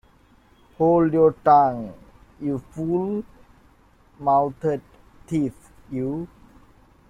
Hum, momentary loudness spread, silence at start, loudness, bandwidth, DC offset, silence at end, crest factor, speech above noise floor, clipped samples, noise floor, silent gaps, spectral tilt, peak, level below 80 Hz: none; 16 LU; 0.8 s; -22 LUFS; 10.5 kHz; under 0.1%; 0.85 s; 20 dB; 35 dB; under 0.1%; -55 dBFS; none; -9 dB/octave; -4 dBFS; -54 dBFS